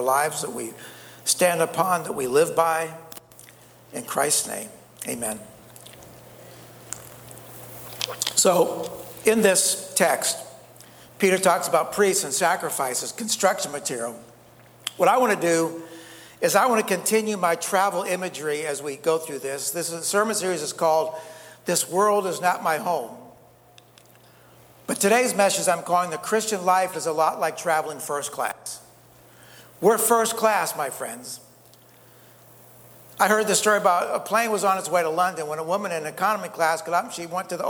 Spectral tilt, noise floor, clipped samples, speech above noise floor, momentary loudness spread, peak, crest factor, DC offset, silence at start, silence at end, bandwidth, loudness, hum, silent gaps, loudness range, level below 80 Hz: -2.5 dB/octave; -53 dBFS; under 0.1%; 30 dB; 18 LU; -2 dBFS; 22 dB; under 0.1%; 0 s; 0 s; over 20 kHz; -23 LUFS; none; none; 5 LU; -68 dBFS